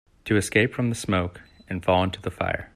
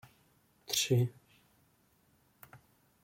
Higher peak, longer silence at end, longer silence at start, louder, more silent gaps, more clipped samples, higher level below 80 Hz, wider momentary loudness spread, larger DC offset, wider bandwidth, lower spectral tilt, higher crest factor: first, -6 dBFS vs -18 dBFS; second, 0.1 s vs 0.5 s; second, 0.25 s vs 0.7 s; first, -24 LUFS vs -32 LUFS; neither; neither; first, -52 dBFS vs -72 dBFS; second, 7 LU vs 27 LU; neither; second, 14 kHz vs 16.5 kHz; first, -5.5 dB/octave vs -4 dB/octave; about the same, 18 dB vs 20 dB